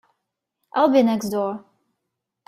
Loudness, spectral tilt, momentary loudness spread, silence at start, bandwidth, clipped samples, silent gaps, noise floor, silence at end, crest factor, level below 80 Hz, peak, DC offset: -20 LUFS; -5.5 dB/octave; 12 LU; 0.75 s; 16 kHz; under 0.1%; none; -81 dBFS; 0.9 s; 18 dB; -66 dBFS; -4 dBFS; under 0.1%